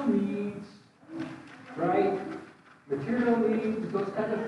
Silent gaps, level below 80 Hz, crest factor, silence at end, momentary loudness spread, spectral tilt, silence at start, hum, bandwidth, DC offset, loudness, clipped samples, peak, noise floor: none; -70 dBFS; 16 dB; 0 s; 18 LU; -8 dB/octave; 0 s; none; 10.5 kHz; under 0.1%; -30 LUFS; under 0.1%; -14 dBFS; -52 dBFS